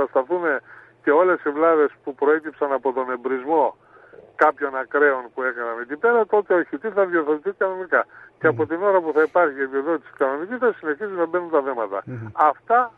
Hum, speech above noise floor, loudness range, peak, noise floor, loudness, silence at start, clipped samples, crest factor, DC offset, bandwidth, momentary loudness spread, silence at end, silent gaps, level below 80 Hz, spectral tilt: none; 26 dB; 2 LU; -4 dBFS; -47 dBFS; -21 LUFS; 0 s; under 0.1%; 18 dB; under 0.1%; 4 kHz; 8 LU; 0.05 s; none; -72 dBFS; -8.5 dB/octave